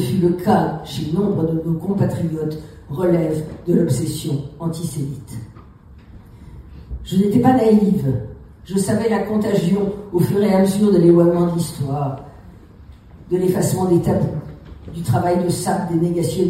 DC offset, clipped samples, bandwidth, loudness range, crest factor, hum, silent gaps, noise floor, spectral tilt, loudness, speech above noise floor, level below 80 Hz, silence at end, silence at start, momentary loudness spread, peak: under 0.1%; under 0.1%; 16 kHz; 6 LU; 16 dB; none; none; -43 dBFS; -7 dB/octave; -18 LUFS; 25 dB; -42 dBFS; 0 s; 0 s; 14 LU; -2 dBFS